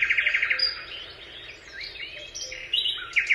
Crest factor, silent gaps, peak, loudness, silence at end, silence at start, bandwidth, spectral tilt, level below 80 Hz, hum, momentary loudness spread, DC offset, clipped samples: 18 dB; none; -10 dBFS; -25 LUFS; 0 s; 0 s; 13 kHz; 1 dB/octave; -58 dBFS; none; 18 LU; under 0.1%; under 0.1%